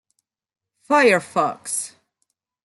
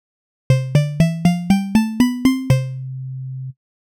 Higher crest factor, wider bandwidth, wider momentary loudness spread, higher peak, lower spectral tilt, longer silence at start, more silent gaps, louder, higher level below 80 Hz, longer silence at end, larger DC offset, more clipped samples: about the same, 20 dB vs 16 dB; second, 12 kHz vs 18 kHz; about the same, 11 LU vs 13 LU; about the same, -4 dBFS vs -2 dBFS; second, -3 dB/octave vs -7 dB/octave; first, 0.9 s vs 0.5 s; neither; about the same, -19 LUFS vs -18 LUFS; second, -74 dBFS vs -42 dBFS; first, 0.75 s vs 0.45 s; neither; neither